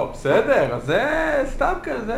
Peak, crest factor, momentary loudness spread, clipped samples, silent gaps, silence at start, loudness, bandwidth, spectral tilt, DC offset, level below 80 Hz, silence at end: -6 dBFS; 16 dB; 5 LU; under 0.1%; none; 0 s; -20 LUFS; 16 kHz; -6 dB/octave; under 0.1%; -36 dBFS; 0 s